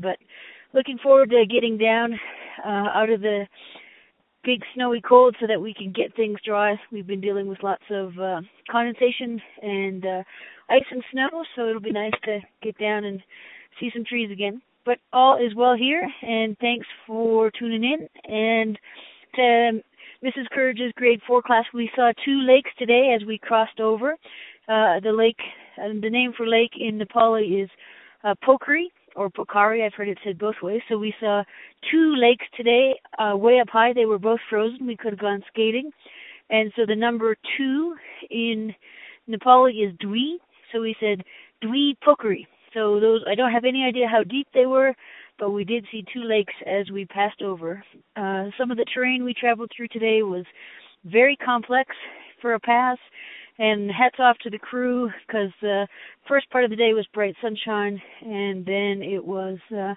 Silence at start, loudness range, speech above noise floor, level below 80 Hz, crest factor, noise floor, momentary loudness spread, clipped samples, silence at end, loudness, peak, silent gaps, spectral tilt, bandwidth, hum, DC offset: 0 s; 5 LU; 36 dB; -72 dBFS; 22 dB; -58 dBFS; 14 LU; under 0.1%; 0 s; -22 LUFS; 0 dBFS; none; -9.5 dB/octave; 4 kHz; none; under 0.1%